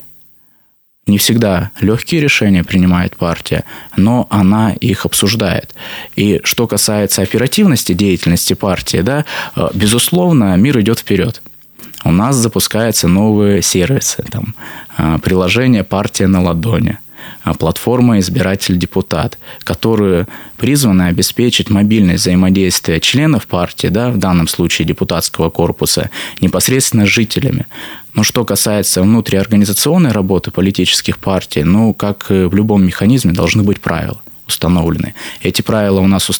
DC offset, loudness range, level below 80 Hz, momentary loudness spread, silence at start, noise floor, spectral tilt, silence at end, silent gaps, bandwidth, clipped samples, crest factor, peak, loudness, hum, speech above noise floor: under 0.1%; 2 LU; -36 dBFS; 9 LU; 0 s; -53 dBFS; -5 dB/octave; 0 s; none; over 20 kHz; under 0.1%; 12 dB; 0 dBFS; -12 LUFS; none; 42 dB